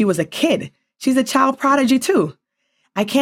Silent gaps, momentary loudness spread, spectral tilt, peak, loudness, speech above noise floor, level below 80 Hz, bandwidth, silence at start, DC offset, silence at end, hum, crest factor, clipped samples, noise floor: none; 9 LU; -4.5 dB/octave; -2 dBFS; -18 LUFS; 51 dB; -62 dBFS; 16.5 kHz; 0 s; under 0.1%; 0 s; none; 16 dB; under 0.1%; -68 dBFS